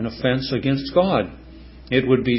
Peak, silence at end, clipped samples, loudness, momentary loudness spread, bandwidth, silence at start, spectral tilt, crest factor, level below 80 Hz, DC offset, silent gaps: -4 dBFS; 0 s; under 0.1%; -21 LUFS; 4 LU; 5.8 kHz; 0 s; -10.5 dB/octave; 16 dB; -42 dBFS; under 0.1%; none